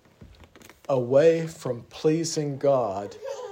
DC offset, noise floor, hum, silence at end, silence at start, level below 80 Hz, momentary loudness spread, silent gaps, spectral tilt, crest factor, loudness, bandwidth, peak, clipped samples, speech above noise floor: under 0.1%; -51 dBFS; none; 0 s; 0.2 s; -62 dBFS; 15 LU; none; -5.5 dB/octave; 18 dB; -24 LUFS; 16 kHz; -8 dBFS; under 0.1%; 27 dB